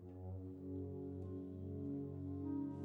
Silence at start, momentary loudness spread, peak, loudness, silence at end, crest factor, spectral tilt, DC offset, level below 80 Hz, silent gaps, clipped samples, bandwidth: 0 s; 6 LU; -34 dBFS; -47 LUFS; 0 s; 12 dB; -12 dB/octave; under 0.1%; -72 dBFS; none; under 0.1%; 3.4 kHz